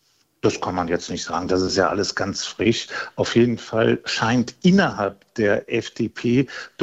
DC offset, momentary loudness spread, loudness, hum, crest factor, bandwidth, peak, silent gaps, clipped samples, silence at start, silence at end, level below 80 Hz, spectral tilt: under 0.1%; 8 LU; -22 LUFS; none; 18 dB; 8.2 kHz; -4 dBFS; none; under 0.1%; 0.45 s; 0 s; -54 dBFS; -5 dB/octave